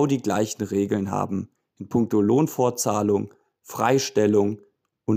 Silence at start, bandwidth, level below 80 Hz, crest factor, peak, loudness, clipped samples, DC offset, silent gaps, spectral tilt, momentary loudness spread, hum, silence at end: 0 s; 16 kHz; -66 dBFS; 16 dB; -6 dBFS; -23 LUFS; under 0.1%; under 0.1%; none; -5.5 dB/octave; 15 LU; none; 0 s